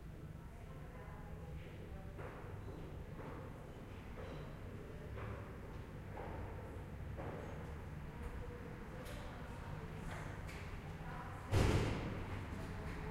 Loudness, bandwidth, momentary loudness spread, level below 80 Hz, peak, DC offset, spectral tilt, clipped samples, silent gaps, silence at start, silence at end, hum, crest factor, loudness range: -47 LUFS; 16 kHz; 10 LU; -52 dBFS; -20 dBFS; under 0.1%; -6.5 dB/octave; under 0.1%; none; 0 s; 0 s; none; 26 dB; 9 LU